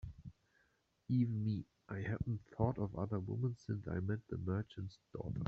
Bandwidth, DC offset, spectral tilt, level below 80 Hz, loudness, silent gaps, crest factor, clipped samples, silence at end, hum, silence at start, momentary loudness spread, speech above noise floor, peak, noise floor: 6.8 kHz; under 0.1%; -9 dB/octave; -60 dBFS; -41 LUFS; none; 18 dB; under 0.1%; 0 s; none; 0.05 s; 12 LU; 38 dB; -22 dBFS; -78 dBFS